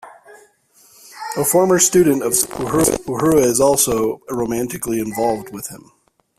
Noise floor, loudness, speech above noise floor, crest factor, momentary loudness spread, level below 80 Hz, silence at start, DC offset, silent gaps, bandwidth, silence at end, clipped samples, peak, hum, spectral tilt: -53 dBFS; -16 LUFS; 36 dB; 18 dB; 13 LU; -46 dBFS; 0.05 s; under 0.1%; none; 16 kHz; 0.6 s; under 0.1%; 0 dBFS; none; -4 dB/octave